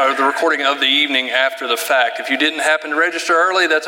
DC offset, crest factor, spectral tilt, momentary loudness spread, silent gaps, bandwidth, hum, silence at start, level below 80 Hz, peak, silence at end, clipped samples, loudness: under 0.1%; 16 dB; 0 dB/octave; 4 LU; none; 17 kHz; none; 0 s; -78 dBFS; 0 dBFS; 0 s; under 0.1%; -15 LUFS